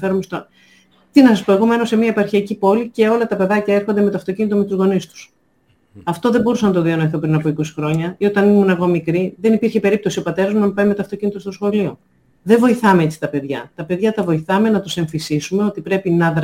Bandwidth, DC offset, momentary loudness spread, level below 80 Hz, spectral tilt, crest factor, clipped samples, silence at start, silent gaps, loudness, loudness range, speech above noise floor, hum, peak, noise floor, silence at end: 16 kHz; under 0.1%; 9 LU; -54 dBFS; -7 dB/octave; 16 dB; under 0.1%; 0 s; none; -16 LUFS; 3 LU; 43 dB; none; 0 dBFS; -59 dBFS; 0 s